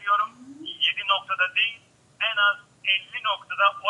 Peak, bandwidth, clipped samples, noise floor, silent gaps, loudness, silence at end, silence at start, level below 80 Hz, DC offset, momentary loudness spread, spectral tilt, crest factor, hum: -6 dBFS; 10.5 kHz; under 0.1%; -48 dBFS; none; -24 LUFS; 0 s; 0 s; -78 dBFS; under 0.1%; 7 LU; -1.5 dB/octave; 20 dB; none